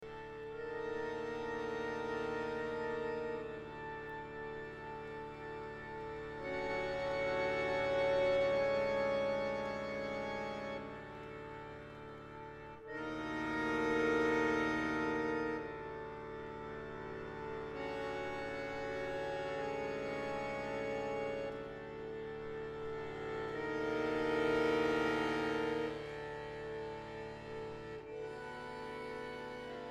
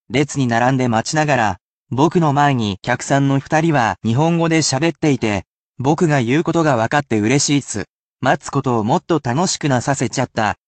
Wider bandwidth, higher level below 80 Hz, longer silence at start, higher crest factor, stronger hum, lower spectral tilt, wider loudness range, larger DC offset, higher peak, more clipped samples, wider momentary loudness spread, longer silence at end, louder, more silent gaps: first, 12 kHz vs 9.2 kHz; second, -62 dBFS vs -52 dBFS; about the same, 0 s vs 0.1 s; about the same, 18 dB vs 16 dB; neither; about the same, -5.5 dB/octave vs -5 dB/octave; first, 9 LU vs 1 LU; neither; second, -22 dBFS vs -2 dBFS; neither; first, 13 LU vs 6 LU; second, 0 s vs 0.15 s; second, -39 LUFS vs -17 LUFS; second, none vs 1.61-1.86 s, 5.47-5.74 s, 7.90-8.16 s